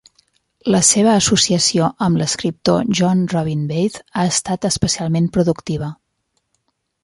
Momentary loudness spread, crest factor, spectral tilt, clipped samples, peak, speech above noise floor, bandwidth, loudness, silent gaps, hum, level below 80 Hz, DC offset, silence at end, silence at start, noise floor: 8 LU; 18 dB; -4 dB/octave; under 0.1%; 0 dBFS; 53 dB; 11.5 kHz; -16 LUFS; none; none; -46 dBFS; under 0.1%; 1.1 s; 0.65 s; -70 dBFS